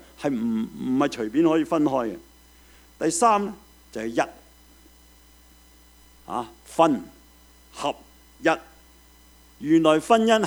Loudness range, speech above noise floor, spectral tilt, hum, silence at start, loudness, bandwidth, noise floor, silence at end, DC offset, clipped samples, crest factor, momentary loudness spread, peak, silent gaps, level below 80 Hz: 6 LU; 31 dB; -4.5 dB/octave; none; 0.2 s; -24 LUFS; over 20 kHz; -53 dBFS; 0 s; under 0.1%; under 0.1%; 22 dB; 15 LU; -4 dBFS; none; -56 dBFS